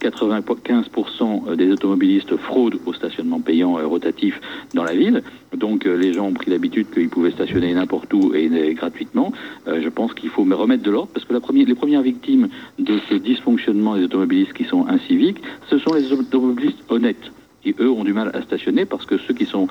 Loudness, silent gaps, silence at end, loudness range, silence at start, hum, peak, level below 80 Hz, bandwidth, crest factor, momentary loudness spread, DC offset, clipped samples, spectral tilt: -19 LUFS; none; 0 s; 2 LU; 0 s; none; -6 dBFS; -58 dBFS; 7.8 kHz; 14 dB; 7 LU; under 0.1%; under 0.1%; -7 dB/octave